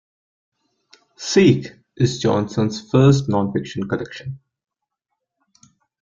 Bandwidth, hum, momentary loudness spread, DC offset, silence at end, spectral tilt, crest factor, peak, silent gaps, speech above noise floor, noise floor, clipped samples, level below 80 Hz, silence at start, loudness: 7.6 kHz; none; 18 LU; under 0.1%; 1.65 s; -6.5 dB/octave; 18 dB; -2 dBFS; none; 61 dB; -79 dBFS; under 0.1%; -52 dBFS; 1.2 s; -19 LUFS